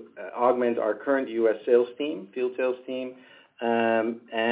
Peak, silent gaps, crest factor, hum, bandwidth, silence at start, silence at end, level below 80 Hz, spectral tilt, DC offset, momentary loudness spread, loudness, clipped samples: -8 dBFS; none; 18 dB; none; 4 kHz; 0 s; 0 s; -78 dBFS; -9 dB/octave; under 0.1%; 10 LU; -26 LUFS; under 0.1%